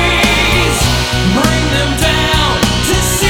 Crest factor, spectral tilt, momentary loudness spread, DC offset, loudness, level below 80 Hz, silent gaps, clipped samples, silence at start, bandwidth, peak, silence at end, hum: 12 dB; -3.5 dB/octave; 3 LU; under 0.1%; -11 LUFS; -20 dBFS; none; under 0.1%; 0 s; over 20 kHz; 0 dBFS; 0 s; none